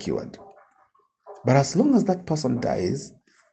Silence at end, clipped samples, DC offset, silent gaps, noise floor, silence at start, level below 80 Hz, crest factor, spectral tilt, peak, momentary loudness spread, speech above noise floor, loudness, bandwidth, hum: 0.45 s; under 0.1%; under 0.1%; none; -63 dBFS; 0 s; -58 dBFS; 20 dB; -6.5 dB/octave; -6 dBFS; 13 LU; 41 dB; -23 LUFS; 8.6 kHz; none